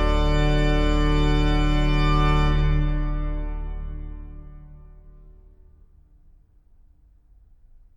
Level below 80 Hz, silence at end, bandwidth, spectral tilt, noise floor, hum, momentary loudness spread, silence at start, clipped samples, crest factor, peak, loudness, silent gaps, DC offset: -24 dBFS; 2.85 s; 7.6 kHz; -7 dB/octave; -54 dBFS; none; 18 LU; 0 s; under 0.1%; 14 dB; -8 dBFS; -23 LUFS; none; under 0.1%